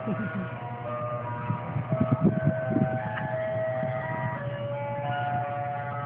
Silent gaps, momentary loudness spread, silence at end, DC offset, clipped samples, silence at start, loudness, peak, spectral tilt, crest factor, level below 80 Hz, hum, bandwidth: none; 8 LU; 0 s; under 0.1%; under 0.1%; 0 s; -30 LUFS; -10 dBFS; -12 dB/octave; 18 dB; -60 dBFS; none; 3.9 kHz